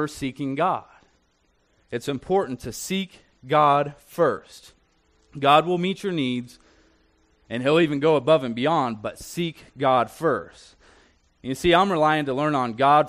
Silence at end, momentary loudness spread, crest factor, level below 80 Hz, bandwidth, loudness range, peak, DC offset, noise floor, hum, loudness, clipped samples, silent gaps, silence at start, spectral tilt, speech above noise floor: 0 s; 14 LU; 20 dB; -54 dBFS; 13 kHz; 4 LU; -4 dBFS; under 0.1%; -66 dBFS; none; -23 LUFS; under 0.1%; none; 0 s; -5.5 dB/octave; 43 dB